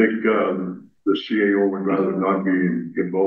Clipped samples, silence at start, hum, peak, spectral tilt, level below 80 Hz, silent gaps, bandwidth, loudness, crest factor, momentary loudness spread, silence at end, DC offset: under 0.1%; 0 s; none; -4 dBFS; -9 dB/octave; -68 dBFS; none; 5.8 kHz; -21 LUFS; 16 dB; 7 LU; 0 s; under 0.1%